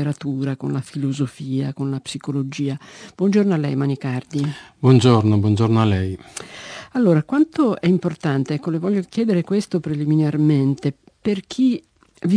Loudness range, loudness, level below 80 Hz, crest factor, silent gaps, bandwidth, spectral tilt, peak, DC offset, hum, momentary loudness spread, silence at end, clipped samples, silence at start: 5 LU; -20 LUFS; -58 dBFS; 18 dB; none; 10.5 kHz; -7.5 dB/octave; -2 dBFS; under 0.1%; none; 11 LU; 0 s; under 0.1%; 0 s